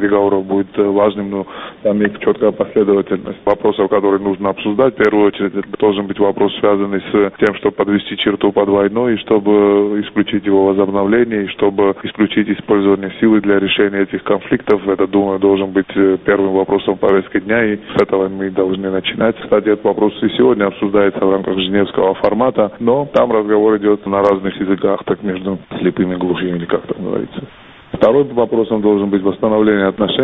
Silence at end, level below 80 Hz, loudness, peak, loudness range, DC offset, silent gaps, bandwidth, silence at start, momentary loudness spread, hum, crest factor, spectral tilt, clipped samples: 0 s; -48 dBFS; -15 LUFS; 0 dBFS; 2 LU; under 0.1%; none; 4.7 kHz; 0 s; 6 LU; none; 14 dB; -4.5 dB/octave; under 0.1%